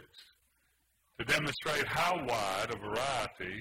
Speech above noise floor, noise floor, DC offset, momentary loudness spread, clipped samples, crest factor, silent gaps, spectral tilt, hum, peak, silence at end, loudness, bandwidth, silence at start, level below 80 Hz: 41 dB; -74 dBFS; under 0.1%; 5 LU; under 0.1%; 20 dB; none; -3 dB/octave; none; -16 dBFS; 0 s; -33 LUFS; 16 kHz; 0 s; -60 dBFS